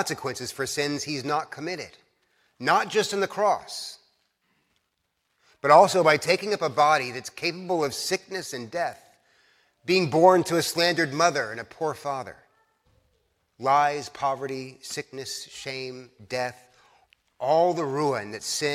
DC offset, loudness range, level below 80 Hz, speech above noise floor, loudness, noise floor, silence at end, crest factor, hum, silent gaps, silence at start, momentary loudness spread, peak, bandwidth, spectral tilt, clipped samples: under 0.1%; 7 LU; -70 dBFS; 51 dB; -25 LUFS; -76 dBFS; 0 s; 22 dB; none; none; 0 s; 16 LU; -4 dBFS; 16 kHz; -3.5 dB/octave; under 0.1%